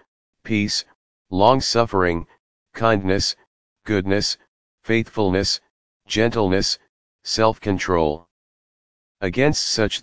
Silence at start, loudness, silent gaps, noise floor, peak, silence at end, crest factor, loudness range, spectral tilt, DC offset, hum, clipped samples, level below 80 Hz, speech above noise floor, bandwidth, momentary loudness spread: 0 s; -21 LUFS; 0.08-0.33 s, 0.95-1.25 s, 2.39-2.66 s, 3.47-3.76 s, 4.48-4.78 s, 5.70-6.00 s, 6.89-7.19 s, 8.31-9.15 s; under -90 dBFS; 0 dBFS; 0 s; 20 dB; 2 LU; -4.5 dB/octave; 1%; none; under 0.1%; -42 dBFS; over 70 dB; 8 kHz; 11 LU